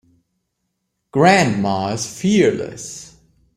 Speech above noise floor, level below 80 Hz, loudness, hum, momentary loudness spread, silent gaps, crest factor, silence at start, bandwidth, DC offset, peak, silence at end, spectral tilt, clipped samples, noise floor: 57 dB; -56 dBFS; -17 LUFS; none; 18 LU; none; 18 dB; 1.15 s; 14.5 kHz; under 0.1%; -2 dBFS; 0.5 s; -5 dB/octave; under 0.1%; -74 dBFS